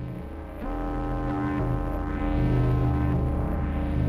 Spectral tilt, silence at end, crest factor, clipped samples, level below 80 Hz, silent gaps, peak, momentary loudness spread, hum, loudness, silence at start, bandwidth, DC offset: -9.5 dB/octave; 0 s; 12 dB; under 0.1%; -30 dBFS; none; -14 dBFS; 11 LU; none; -28 LUFS; 0 s; 5.4 kHz; under 0.1%